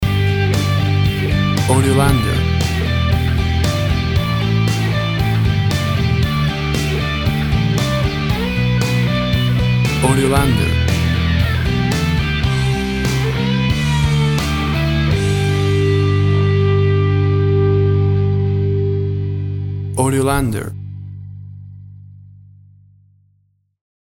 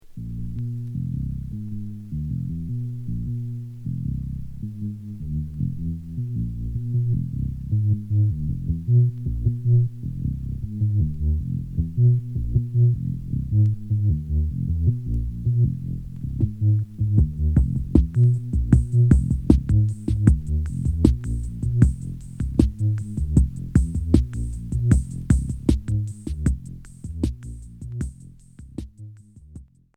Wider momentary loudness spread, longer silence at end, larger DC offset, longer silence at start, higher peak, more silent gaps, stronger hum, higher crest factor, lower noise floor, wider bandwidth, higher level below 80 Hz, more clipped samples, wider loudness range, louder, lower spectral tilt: second, 4 LU vs 13 LU; first, 1.9 s vs 0.3 s; neither; about the same, 0 s vs 0.05 s; about the same, 0 dBFS vs 0 dBFS; neither; first, 50 Hz at -40 dBFS vs none; second, 16 dB vs 22 dB; first, -61 dBFS vs -45 dBFS; first, over 20 kHz vs 9.6 kHz; about the same, -26 dBFS vs -28 dBFS; neither; second, 5 LU vs 10 LU; first, -16 LUFS vs -24 LUFS; second, -6 dB/octave vs -9.5 dB/octave